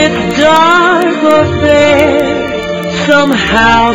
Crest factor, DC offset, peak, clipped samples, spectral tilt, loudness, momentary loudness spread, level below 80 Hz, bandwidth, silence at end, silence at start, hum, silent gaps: 8 dB; under 0.1%; 0 dBFS; 0.4%; -5 dB/octave; -8 LUFS; 8 LU; -32 dBFS; 16.5 kHz; 0 s; 0 s; none; none